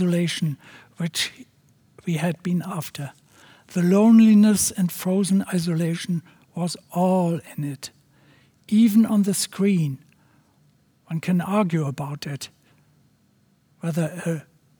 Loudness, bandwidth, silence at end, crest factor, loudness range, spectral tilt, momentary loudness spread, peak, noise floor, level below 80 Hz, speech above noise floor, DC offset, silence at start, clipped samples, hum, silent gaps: -22 LUFS; over 20 kHz; 0.4 s; 16 dB; 9 LU; -5.5 dB/octave; 16 LU; -6 dBFS; -62 dBFS; -68 dBFS; 41 dB; under 0.1%; 0 s; under 0.1%; none; none